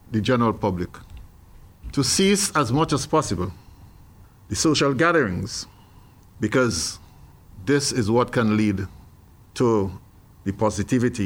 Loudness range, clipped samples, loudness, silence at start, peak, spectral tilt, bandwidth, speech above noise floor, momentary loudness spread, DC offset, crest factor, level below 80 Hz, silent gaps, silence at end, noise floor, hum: 2 LU; under 0.1%; -22 LUFS; 0.1 s; -6 dBFS; -4.5 dB/octave; 17 kHz; 28 dB; 14 LU; under 0.1%; 16 dB; -46 dBFS; none; 0 s; -49 dBFS; none